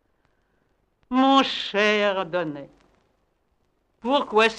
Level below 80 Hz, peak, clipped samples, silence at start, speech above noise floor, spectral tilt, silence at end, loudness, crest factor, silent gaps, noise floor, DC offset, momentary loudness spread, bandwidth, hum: -64 dBFS; -4 dBFS; under 0.1%; 1.1 s; 46 dB; -4 dB/octave; 0 s; -22 LUFS; 20 dB; none; -69 dBFS; under 0.1%; 13 LU; 9.8 kHz; none